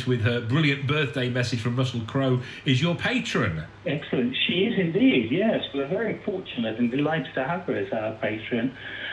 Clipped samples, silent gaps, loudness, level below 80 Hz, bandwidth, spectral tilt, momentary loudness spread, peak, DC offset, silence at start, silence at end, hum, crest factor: under 0.1%; none; -25 LUFS; -58 dBFS; 11 kHz; -6.5 dB/octave; 7 LU; -8 dBFS; under 0.1%; 0 s; 0 s; none; 16 dB